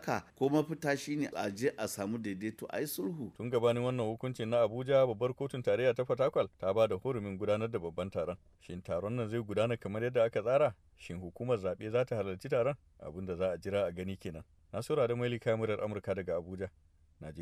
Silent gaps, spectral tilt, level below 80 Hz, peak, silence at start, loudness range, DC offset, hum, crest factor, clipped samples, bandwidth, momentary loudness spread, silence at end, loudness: none; -6.5 dB/octave; -64 dBFS; -16 dBFS; 0 s; 4 LU; under 0.1%; none; 18 dB; under 0.1%; 15.5 kHz; 13 LU; 0 s; -34 LUFS